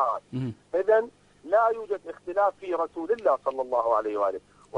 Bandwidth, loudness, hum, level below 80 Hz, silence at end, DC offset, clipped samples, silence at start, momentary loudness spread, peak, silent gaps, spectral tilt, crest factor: 10 kHz; -27 LUFS; 50 Hz at -65 dBFS; -66 dBFS; 0 s; under 0.1%; under 0.1%; 0 s; 10 LU; -10 dBFS; none; -7.5 dB/octave; 16 dB